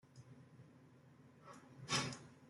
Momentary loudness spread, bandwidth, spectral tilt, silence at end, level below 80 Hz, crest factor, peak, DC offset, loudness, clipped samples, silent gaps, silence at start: 25 LU; 11.5 kHz; -2.5 dB/octave; 0 s; -80 dBFS; 24 dB; -24 dBFS; under 0.1%; -42 LUFS; under 0.1%; none; 0.05 s